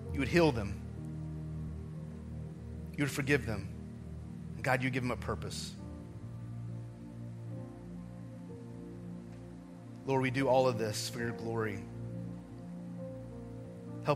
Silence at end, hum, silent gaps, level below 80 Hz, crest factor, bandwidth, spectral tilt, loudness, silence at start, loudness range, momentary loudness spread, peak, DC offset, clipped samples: 0 s; none; none; -54 dBFS; 24 dB; 15.5 kHz; -6 dB/octave; -37 LUFS; 0 s; 11 LU; 16 LU; -12 dBFS; under 0.1%; under 0.1%